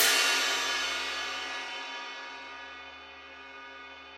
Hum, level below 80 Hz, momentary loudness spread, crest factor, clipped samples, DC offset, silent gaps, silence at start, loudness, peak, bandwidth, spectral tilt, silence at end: none; -70 dBFS; 21 LU; 24 dB; under 0.1%; under 0.1%; none; 0 s; -29 LUFS; -8 dBFS; 16 kHz; 2 dB/octave; 0 s